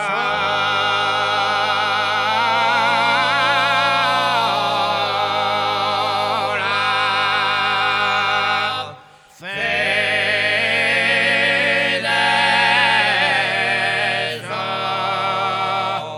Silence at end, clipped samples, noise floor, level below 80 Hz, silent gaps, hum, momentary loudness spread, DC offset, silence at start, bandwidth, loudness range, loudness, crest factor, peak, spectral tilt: 0 s; under 0.1%; -44 dBFS; -68 dBFS; none; none; 6 LU; under 0.1%; 0 s; 18 kHz; 3 LU; -17 LUFS; 18 dB; 0 dBFS; -2.5 dB/octave